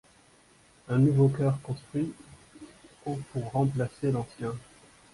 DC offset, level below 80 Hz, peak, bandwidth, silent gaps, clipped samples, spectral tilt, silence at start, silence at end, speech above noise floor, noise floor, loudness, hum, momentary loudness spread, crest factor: under 0.1%; -60 dBFS; -14 dBFS; 11.5 kHz; none; under 0.1%; -8.5 dB/octave; 0.9 s; 0.55 s; 32 dB; -60 dBFS; -29 LUFS; none; 21 LU; 16 dB